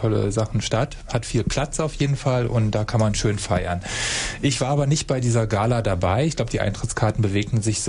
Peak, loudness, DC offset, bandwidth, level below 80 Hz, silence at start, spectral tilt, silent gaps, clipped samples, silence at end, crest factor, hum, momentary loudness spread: -8 dBFS; -22 LUFS; under 0.1%; 11 kHz; -36 dBFS; 0 s; -5 dB/octave; none; under 0.1%; 0 s; 14 dB; none; 4 LU